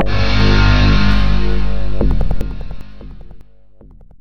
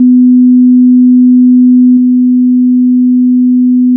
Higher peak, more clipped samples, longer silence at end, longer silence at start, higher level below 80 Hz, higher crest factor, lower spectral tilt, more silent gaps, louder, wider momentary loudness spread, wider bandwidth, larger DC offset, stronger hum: about the same, 0 dBFS vs 0 dBFS; neither; about the same, 0 s vs 0 s; about the same, 0 s vs 0 s; first, -18 dBFS vs -78 dBFS; first, 14 dB vs 4 dB; second, -6.5 dB/octave vs -16 dB/octave; neither; second, -16 LUFS vs -6 LUFS; first, 23 LU vs 3 LU; first, 6.6 kHz vs 0.3 kHz; first, 20% vs under 0.1%; neither